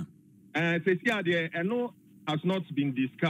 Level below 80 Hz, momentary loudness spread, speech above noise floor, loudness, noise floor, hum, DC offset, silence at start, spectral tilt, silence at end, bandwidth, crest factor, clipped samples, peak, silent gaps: -78 dBFS; 9 LU; 27 dB; -29 LUFS; -56 dBFS; none; under 0.1%; 0 s; -7 dB/octave; 0 s; 12 kHz; 16 dB; under 0.1%; -14 dBFS; none